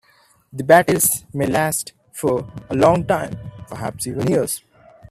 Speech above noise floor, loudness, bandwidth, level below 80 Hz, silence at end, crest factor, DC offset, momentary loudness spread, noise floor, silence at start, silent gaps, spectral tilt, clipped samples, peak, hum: 38 dB; -19 LUFS; 16 kHz; -50 dBFS; 0.5 s; 20 dB; under 0.1%; 16 LU; -56 dBFS; 0.55 s; none; -4.5 dB/octave; under 0.1%; 0 dBFS; none